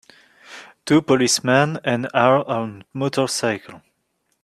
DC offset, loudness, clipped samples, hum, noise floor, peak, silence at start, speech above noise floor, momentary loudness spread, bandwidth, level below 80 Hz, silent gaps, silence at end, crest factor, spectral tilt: under 0.1%; -19 LUFS; under 0.1%; none; -70 dBFS; 0 dBFS; 0.5 s; 51 dB; 14 LU; 14 kHz; -62 dBFS; none; 0.65 s; 20 dB; -4.5 dB/octave